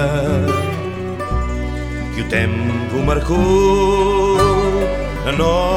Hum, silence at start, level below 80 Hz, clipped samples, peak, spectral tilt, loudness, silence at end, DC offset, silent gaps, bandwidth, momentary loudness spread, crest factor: none; 0 s; -26 dBFS; under 0.1%; -2 dBFS; -6.5 dB/octave; -17 LUFS; 0 s; under 0.1%; none; 15 kHz; 10 LU; 14 dB